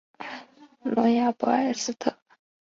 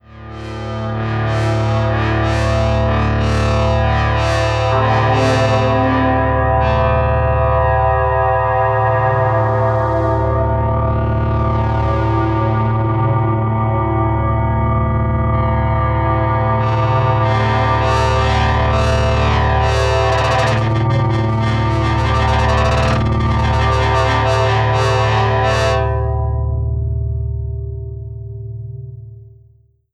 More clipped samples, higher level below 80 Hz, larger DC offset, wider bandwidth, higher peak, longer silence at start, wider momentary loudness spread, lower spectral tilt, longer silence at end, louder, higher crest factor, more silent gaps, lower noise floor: neither; second, -72 dBFS vs -24 dBFS; neither; second, 7.8 kHz vs 9.2 kHz; second, -8 dBFS vs -2 dBFS; about the same, 0.2 s vs 0.1 s; first, 16 LU vs 6 LU; second, -4 dB/octave vs -7 dB/octave; second, 0.5 s vs 0.65 s; second, -25 LUFS vs -15 LUFS; first, 18 dB vs 12 dB; neither; about the same, -48 dBFS vs -51 dBFS